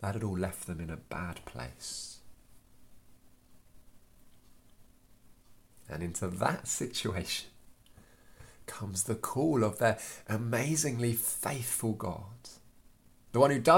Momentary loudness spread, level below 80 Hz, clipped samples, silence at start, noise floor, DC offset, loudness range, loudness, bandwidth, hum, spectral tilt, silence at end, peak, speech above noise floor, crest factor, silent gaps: 16 LU; -58 dBFS; under 0.1%; 0 s; -60 dBFS; under 0.1%; 16 LU; -33 LUFS; 17 kHz; none; -4.5 dB/octave; 0 s; -10 dBFS; 28 dB; 26 dB; none